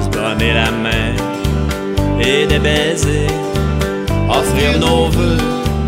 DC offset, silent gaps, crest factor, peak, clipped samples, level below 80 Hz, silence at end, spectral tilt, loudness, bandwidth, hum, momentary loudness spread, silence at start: under 0.1%; none; 14 dB; 0 dBFS; under 0.1%; -22 dBFS; 0 s; -5 dB/octave; -15 LUFS; 16 kHz; none; 5 LU; 0 s